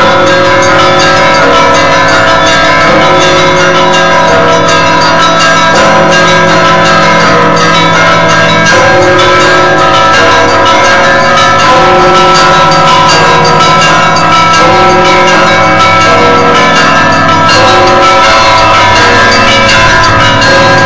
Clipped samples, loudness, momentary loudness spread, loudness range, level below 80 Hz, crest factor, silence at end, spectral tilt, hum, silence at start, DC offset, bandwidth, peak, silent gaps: 10%; -3 LUFS; 2 LU; 1 LU; -28 dBFS; 4 dB; 0 s; -3.5 dB/octave; none; 0 s; 10%; 8 kHz; 0 dBFS; none